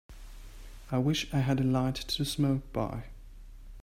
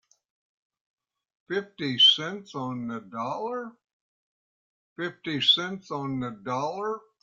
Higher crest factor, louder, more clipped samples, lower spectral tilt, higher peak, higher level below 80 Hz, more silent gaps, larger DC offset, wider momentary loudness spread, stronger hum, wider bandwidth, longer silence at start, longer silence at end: second, 16 dB vs 22 dB; second, -30 LUFS vs -26 LUFS; neither; first, -6 dB/octave vs -4 dB/octave; second, -14 dBFS vs -8 dBFS; first, -46 dBFS vs -72 dBFS; second, none vs 3.93-4.96 s; neither; first, 23 LU vs 17 LU; neither; first, 16 kHz vs 13.5 kHz; second, 0.1 s vs 1.5 s; second, 0 s vs 0.2 s